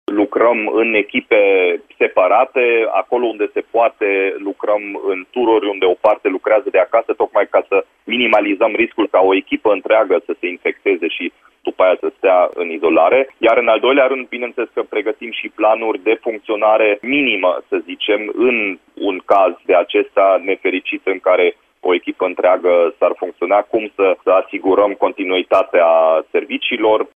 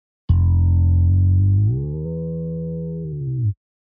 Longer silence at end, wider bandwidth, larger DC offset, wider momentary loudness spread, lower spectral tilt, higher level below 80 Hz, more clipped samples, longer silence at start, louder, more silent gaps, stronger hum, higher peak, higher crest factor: second, 0.15 s vs 0.3 s; first, 4.6 kHz vs 1.2 kHz; neither; second, 8 LU vs 11 LU; second, -6 dB/octave vs -14.5 dB/octave; second, -62 dBFS vs -28 dBFS; neither; second, 0.1 s vs 0.3 s; first, -15 LUFS vs -20 LUFS; neither; neither; first, 0 dBFS vs -6 dBFS; about the same, 14 dB vs 14 dB